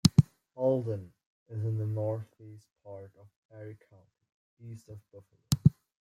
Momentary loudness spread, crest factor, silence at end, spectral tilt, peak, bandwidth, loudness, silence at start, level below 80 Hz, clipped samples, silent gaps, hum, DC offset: 24 LU; 26 dB; 0.3 s; -7 dB/octave; -6 dBFS; 15.5 kHz; -31 LUFS; 0.05 s; -56 dBFS; under 0.1%; 1.26-1.46 s, 3.36-3.49 s, 4.34-4.57 s; none; under 0.1%